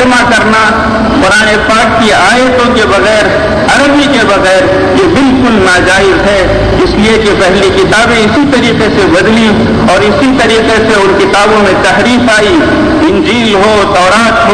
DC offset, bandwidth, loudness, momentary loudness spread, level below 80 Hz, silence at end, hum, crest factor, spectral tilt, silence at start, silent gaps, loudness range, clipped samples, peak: 0.4%; 10.5 kHz; -6 LUFS; 2 LU; -24 dBFS; 0 s; none; 6 dB; -4.5 dB/octave; 0 s; none; 0 LU; under 0.1%; 0 dBFS